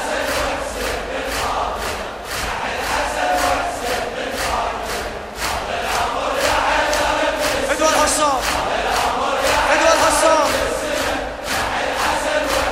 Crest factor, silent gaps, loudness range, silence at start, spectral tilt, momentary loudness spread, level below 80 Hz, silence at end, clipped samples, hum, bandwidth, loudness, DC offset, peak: 18 dB; none; 5 LU; 0 s; -2 dB/octave; 9 LU; -36 dBFS; 0 s; under 0.1%; none; 16.5 kHz; -19 LUFS; under 0.1%; -2 dBFS